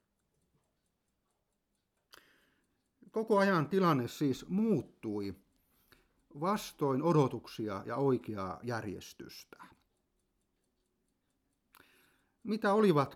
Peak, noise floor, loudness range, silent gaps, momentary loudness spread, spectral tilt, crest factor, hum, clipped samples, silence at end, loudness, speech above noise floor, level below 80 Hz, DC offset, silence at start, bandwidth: -16 dBFS; -82 dBFS; 12 LU; none; 16 LU; -7 dB/octave; 20 dB; none; under 0.1%; 0 s; -33 LUFS; 50 dB; -74 dBFS; under 0.1%; 3.15 s; 16 kHz